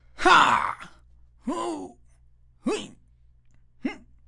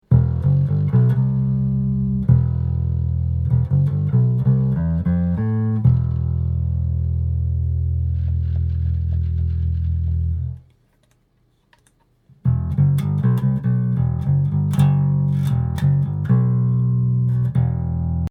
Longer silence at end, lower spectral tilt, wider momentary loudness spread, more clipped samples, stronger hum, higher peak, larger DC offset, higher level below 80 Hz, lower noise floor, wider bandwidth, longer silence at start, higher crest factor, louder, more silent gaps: first, 0.3 s vs 0 s; second, -3 dB/octave vs -10.5 dB/octave; first, 22 LU vs 5 LU; neither; neither; about the same, -4 dBFS vs -2 dBFS; neither; second, -52 dBFS vs -30 dBFS; second, -57 dBFS vs -62 dBFS; first, 11.5 kHz vs 3.9 kHz; about the same, 0.15 s vs 0.1 s; first, 24 dB vs 16 dB; second, -24 LUFS vs -20 LUFS; neither